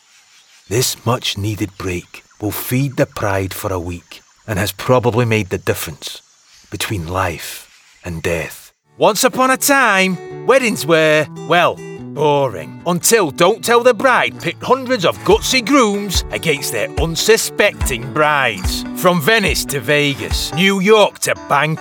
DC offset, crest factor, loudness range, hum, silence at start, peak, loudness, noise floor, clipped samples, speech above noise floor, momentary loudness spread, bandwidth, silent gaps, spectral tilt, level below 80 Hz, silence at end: under 0.1%; 16 dB; 7 LU; none; 0.7 s; 0 dBFS; -15 LUFS; -49 dBFS; under 0.1%; 33 dB; 12 LU; 19 kHz; none; -4 dB/octave; -34 dBFS; 0 s